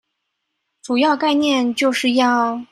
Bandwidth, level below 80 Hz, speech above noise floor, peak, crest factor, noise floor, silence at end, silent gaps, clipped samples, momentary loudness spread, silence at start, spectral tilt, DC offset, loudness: 13 kHz; -68 dBFS; 58 dB; -4 dBFS; 14 dB; -75 dBFS; 0.1 s; none; under 0.1%; 3 LU; 0.85 s; -3 dB/octave; under 0.1%; -17 LUFS